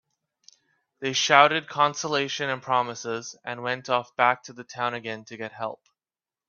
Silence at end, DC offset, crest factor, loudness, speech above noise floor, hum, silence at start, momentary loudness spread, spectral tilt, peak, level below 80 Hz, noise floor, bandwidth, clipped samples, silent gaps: 0.75 s; under 0.1%; 26 dB; -25 LUFS; over 65 dB; none; 1 s; 17 LU; -2.5 dB/octave; 0 dBFS; -74 dBFS; under -90 dBFS; 7.4 kHz; under 0.1%; none